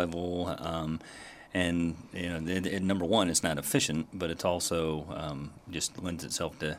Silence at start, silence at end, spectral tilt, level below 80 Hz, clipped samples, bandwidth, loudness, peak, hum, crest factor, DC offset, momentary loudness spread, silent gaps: 0 s; 0 s; -4 dB/octave; -54 dBFS; under 0.1%; 16 kHz; -31 LUFS; -10 dBFS; none; 22 dB; under 0.1%; 10 LU; none